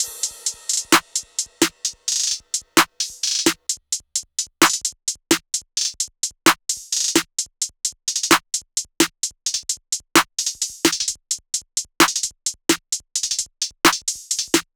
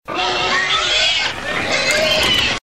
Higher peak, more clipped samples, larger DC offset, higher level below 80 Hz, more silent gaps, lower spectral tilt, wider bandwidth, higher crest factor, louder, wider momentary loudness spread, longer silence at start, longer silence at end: about the same, -2 dBFS vs -2 dBFS; neither; neither; second, -58 dBFS vs -40 dBFS; neither; about the same, -0.5 dB/octave vs -1.5 dB/octave; first, over 20 kHz vs 16 kHz; first, 22 dB vs 16 dB; second, -20 LUFS vs -15 LUFS; about the same, 8 LU vs 6 LU; about the same, 0 s vs 0 s; first, 0.15 s vs 0 s